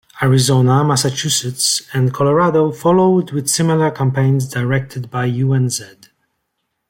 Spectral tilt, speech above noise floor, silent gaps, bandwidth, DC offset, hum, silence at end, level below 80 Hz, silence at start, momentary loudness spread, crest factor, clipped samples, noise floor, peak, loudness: -5 dB/octave; 57 dB; none; 16.5 kHz; under 0.1%; none; 1.05 s; -54 dBFS; 0.15 s; 7 LU; 12 dB; under 0.1%; -72 dBFS; -2 dBFS; -15 LUFS